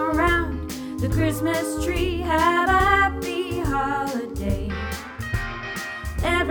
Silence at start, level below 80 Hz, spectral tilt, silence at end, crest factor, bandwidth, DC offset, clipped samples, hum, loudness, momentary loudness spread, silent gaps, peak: 0 s; -32 dBFS; -5.5 dB/octave; 0 s; 16 dB; over 20 kHz; under 0.1%; under 0.1%; none; -23 LUFS; 11 LU; none; -6 dBFS